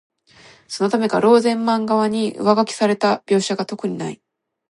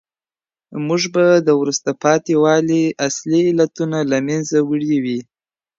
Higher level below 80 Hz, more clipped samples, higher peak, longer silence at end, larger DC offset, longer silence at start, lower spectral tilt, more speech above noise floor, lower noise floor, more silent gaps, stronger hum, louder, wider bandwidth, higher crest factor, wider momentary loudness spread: about the same, -68 dBFS vs -64 dBFS; neither; about the same, 0 dBFS vs -2 dBFS; about the same, 0.55 s vs 0.55 s; neither; about the same, 0.7 s vs 0.7 s; about the same, -5 dB/octave vs -5 dB/octave; second, 31 dB vs over 74 dB; second, -49 dBFS vs under -90 dBFS; neither; neither; about the same, -18 LUFS vs -17 LUFS; first, 11.5 kHz vs 7.8 kHz; about the same, 18 dB vs 16 dB; first, 11 LU vs 7 LU